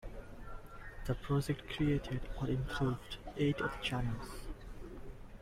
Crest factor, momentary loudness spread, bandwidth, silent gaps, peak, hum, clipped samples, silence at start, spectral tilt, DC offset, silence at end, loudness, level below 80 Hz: 16 dB; 17 LU; 15 kHz; none; -22 dBFS; none; under 0.1%; 0 s; -6.5 dB/octave; under 0.1%; 0 s; -38 LUFS; -48 dBFS